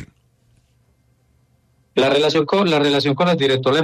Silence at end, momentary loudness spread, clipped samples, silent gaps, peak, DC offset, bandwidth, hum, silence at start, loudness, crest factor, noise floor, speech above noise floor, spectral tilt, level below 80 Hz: 0 s; 2 LU; under 0.1%; none; -6 dBFS; under 0.1%; 13.5 kHz; none; 0 s; -17 LUFS; 14 dB; -60 dBFS; 44 dB; -5.5 dB/octave; -58 dBFS